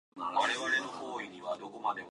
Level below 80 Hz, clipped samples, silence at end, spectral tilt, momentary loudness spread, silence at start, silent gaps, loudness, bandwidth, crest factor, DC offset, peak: -78 dBFS; under 0.1%; 0 s; -2 dB/octave; 10 LU; 0.15 s; none; -34 LUFS; 11.5 kHz; 18 dB; under 0.1%; -16 dBFS